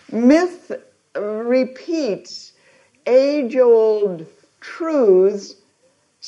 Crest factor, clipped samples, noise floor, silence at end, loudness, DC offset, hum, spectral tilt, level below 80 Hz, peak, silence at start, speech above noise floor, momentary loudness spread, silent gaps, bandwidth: 16 dB; under 0.1%; -61 dBFS; 0 s; -17 LUFS; under 0.1%; none; -6 dB/octave; -70 dBFS; -2 dBFS; 0.1 s; 44 dB; 20 LU; none; 8.4 kHz